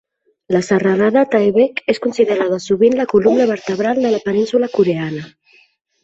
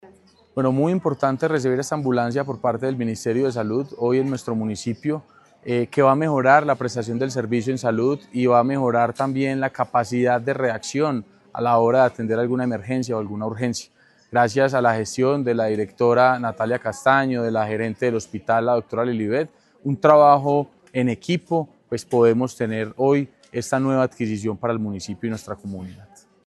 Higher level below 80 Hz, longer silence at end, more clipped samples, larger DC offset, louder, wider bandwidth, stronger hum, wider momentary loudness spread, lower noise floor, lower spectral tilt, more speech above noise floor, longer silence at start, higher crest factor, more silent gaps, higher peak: first, -56 dBFS vs -64 dBFS; first, 0.75 s vs 0.4 s; neither; neither; first, -15 LUFS vs -21 LUFS; second, 8 kHz vs 12.5 kHz; neither; second, 6 LU vs 11 LU; about the same, -54 dBFS vs -53 dBFS; about the same, -6.5 dB/octave vs -6.5 dB/octave; first, 39 dB vs 32 dB; first, 0.5 s vs 0.05 s; second, 14 dB vs 20 dB; neither; about the same, -2 dBFS vs 0 dBFS